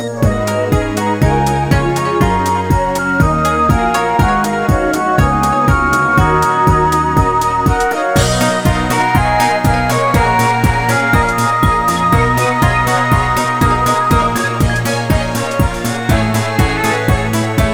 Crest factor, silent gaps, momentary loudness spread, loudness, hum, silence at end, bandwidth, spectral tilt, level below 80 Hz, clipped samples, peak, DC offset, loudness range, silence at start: 12 dB; none; 3 LU; -13 LUFS; none; 0 s; over 20 kHz; -5.5 dB/octave; -24 dBFS; under 0.1%; 0 dBFS; 0.2%; 2 LU; 0 s